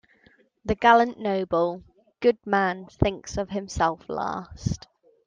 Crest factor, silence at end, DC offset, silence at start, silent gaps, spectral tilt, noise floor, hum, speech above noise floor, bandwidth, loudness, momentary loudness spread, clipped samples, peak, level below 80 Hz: 20 dB; 0.5 s; under 0.1%; 0.65 s; none; -5.5 dB/octave; -60 dBFS; none; 36 dB; 9.6 kHz; -25 LUFS; 13 LU; under 0.1%; -4 dBFS; -44 dBFS